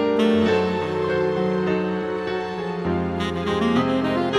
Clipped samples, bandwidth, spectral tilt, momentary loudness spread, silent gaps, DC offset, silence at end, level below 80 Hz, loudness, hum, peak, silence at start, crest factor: under 0.1%; 12 kHz; -7 dB/octave; 7 LU; none; under 0.1%; 0 s; -48 dBFS; -22 LUFS; none; -8 dBFS; 0 s; 14 dB